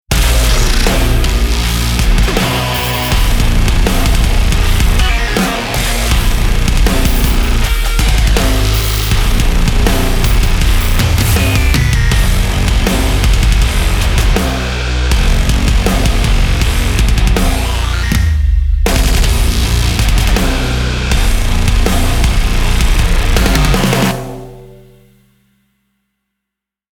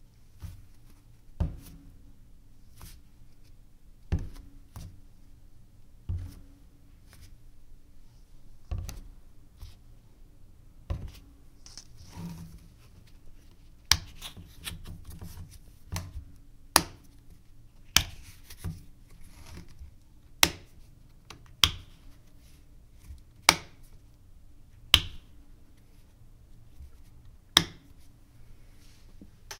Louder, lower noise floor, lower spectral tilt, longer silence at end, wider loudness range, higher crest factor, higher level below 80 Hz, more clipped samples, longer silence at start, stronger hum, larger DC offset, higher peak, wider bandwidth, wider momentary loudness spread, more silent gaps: first, -13 LUFS vs -28 LUFS; first, -80 dBFS vs -54 dBFS; first, -4.5 dB/octave vs -1.5 dB/octave; first, 2.25 s vs 0 s; second, 1 LU vs 18 LU; second, 8 dB vs 36 dB; first, -12 dBFS vs -46 dBFS; neither; about the same, 0.1 s vs 0 s; neither; neither; about the same, -2 dBFS vs 0 dBFS; first, over 20 kHz vs 16 kHz; second, 3 LU vs 28 LU; neither